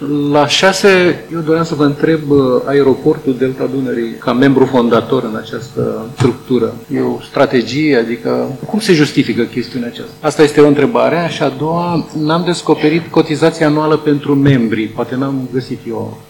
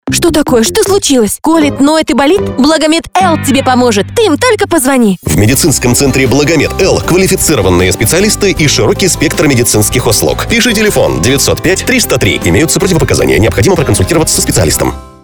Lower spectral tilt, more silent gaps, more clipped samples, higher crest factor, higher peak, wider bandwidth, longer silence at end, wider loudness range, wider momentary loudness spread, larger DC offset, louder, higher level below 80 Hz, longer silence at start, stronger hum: first, -6 dB/octave vs -4 dB/octave; neither; first, 0.6% vs under 0.1%; about the same, 12 dB vs 8 dB; about the same, 0 dBFS vs 0 dBFS; second, 17.5 kHz vs over 20 kHz; about the same, 0.1 s vs 0.15 s; about the same, 2 LU vs 1 LU; first, 10 LU vs 2 LU; second, under 0.1% vs 0.6%; second, -13 LUFS vs -8 LUFS; second, -48 dBFS vs -26 dBFS; about the same, 0 s vs 0.05 s; first, 50 Hz at -40 dBFS vs none